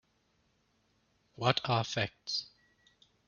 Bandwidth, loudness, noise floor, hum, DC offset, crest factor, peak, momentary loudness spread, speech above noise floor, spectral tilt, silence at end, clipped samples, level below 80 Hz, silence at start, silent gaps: 7.2 kHz; -33 LUFS; -74 dBFS; none; under 0.1%; 30 dB; -8 dBFS; 7 LU; 41 dB; -3 dB/octave; 0.8 s; under 0.1%; -70 dBFS; 1.4 s; none